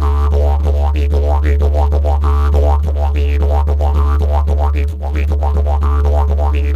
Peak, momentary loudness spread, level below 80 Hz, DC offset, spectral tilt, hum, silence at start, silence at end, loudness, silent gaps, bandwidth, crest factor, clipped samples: -2 dBFS; 2 LU; -12 dBFS; under 0.1%; -8.5 dB/octave; none; 0 s; 0 s; -15 LUFS; none; 4.5 kHz; 10 dB; under 0.1%